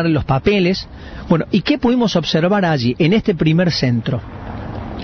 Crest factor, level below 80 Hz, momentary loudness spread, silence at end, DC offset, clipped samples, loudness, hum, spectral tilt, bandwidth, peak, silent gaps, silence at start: 14 dB; -36 dBFS; 13 LU; 0 s; under 0.1%; under 0.1%; -16 LUFS; none; -7 dB/octave; 6.6 kHz; -2 dBFS; none; 0 s